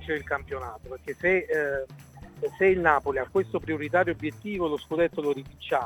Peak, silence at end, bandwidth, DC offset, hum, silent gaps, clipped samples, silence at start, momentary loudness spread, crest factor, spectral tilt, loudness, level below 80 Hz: -6 dBFS; 0 s; 17.5 kHz; under 0.1%; none; none; under 0.1%; 0 s; 13 LU; 22 dB; -6.5 dB/octave; -27 LUFS; -52 dBFS